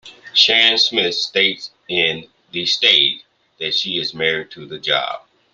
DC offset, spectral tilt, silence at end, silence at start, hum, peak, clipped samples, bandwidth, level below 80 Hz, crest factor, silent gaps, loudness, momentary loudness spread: under 0.1%; -2 dB/octave; 0.35 s; 0.05 s; none; 0 dBFS; under 0.1%; 10 kHz; -64 dBFS; 20 dB; none; -15 LUFS; 17 LU